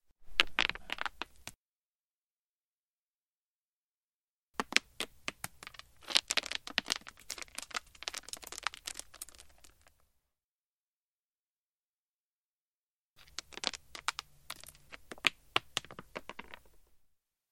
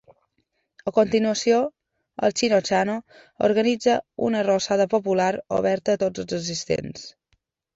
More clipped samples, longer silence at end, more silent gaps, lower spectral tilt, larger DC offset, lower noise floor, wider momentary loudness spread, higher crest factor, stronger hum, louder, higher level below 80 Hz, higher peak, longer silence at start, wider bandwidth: neither; about the same, 0.55 s vs 0.65 s; first, 1.57-4.54 s, 10.44-13.16 s vs none; second, 0 dB/octave vs -4.5 dB/octave; neither; first, under -90 dBFS vs -73 dBFS; first, 19 LU vs 10 LU; first, 40 dB vs 18 dB; neither; second, -36 LUFS vs -23 LUFS; about the same, -64 dBFS vs -60 dBFS; first, -2 dBFS vs -6 dBFS; second, 0.2 s vs 0.85 s; first, 16.5 kHz vs 8 kHz